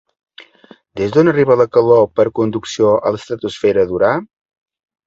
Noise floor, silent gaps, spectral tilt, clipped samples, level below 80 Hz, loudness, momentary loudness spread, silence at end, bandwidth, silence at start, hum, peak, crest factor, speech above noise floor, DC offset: -46 dBFS; none; -6.5 dB/octave; under 0.1%; -50 dBFS; -14 LUFS; 11 LU; 0.8 s; 7.8 kHz; 0.95 s; none; 0 dBFS; 16 dB; 33 dB; under 0.1%